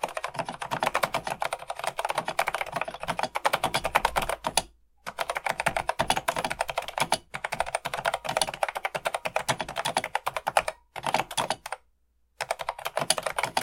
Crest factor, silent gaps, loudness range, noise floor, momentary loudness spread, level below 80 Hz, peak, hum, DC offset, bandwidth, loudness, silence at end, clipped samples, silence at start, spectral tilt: 28 dB; none; 2 LU; -68 dBFS; 8 LU; -52 dBFS; -2 dBFS; none; under 0.1%; 17 kHz; -29 LUFS; 0 s; under 0.1%; 0 s; -2 dB/octave